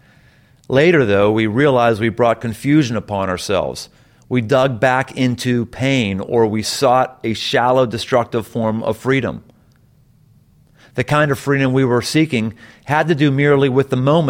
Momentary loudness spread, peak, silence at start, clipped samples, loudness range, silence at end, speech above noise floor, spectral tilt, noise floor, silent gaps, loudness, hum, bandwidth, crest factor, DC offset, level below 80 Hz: 8 LU; -2 dBFS; 0.7 s; under 0.1%; 4 LU; 0 s; 36 dB; -6 dB/octave; -52 dBFS; none; -16 LUFS; none; 16.5 kHz; 14 dB; under 0.1%; -50 dBFS